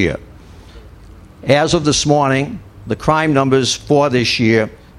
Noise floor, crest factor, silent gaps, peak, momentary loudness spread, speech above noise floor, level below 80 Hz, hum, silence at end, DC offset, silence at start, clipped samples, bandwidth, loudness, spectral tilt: -39 dBFS; 16 dB; none; 0 dBFS; 12 LU; 25 dB; -40 dBFS; none; 0.25 s; under 0.1%; 0 s; under 0.1%; 12.5 kHz; -15 LUFS; -4.5 dB/octave